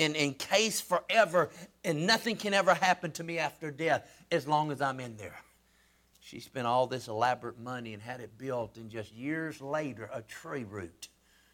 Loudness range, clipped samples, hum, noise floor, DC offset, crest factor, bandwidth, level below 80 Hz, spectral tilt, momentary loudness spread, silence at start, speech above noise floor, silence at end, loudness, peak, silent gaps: 10 LU; under 0.1%; none; -67 dBFS; under 0.1%; 22 dB; 19 kHz; -72 dBFS; -3.5 dB/octave; 17 LU; 0 s; 35 dB; 0.5 s; -31 LUFS; -12 dBFS; none